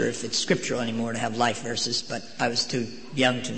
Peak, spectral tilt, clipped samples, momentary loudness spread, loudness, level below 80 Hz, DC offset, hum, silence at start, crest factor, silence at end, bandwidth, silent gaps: -8 dBFS; -3.5 dB/octave; under 0.1%; 5 LU; -26 LUFS; -62 dBFS; 0.9%; none; 0 s; 20 dB; 0 s; 8.8 kHz; none